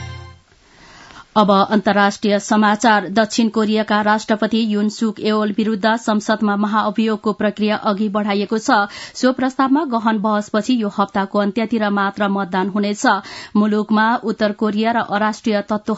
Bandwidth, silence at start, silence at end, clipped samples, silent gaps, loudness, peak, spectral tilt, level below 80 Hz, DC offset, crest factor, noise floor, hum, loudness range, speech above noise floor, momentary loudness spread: 8 kHz; 0 s; 0 s; under 0.1%; none; -17 LUFS; 0 dBFS; -5 dB/octave; -58 dBFS; under 0.1%; 18 dB; -48 dBFS; none; 2 LU; 32 dB; 5 LU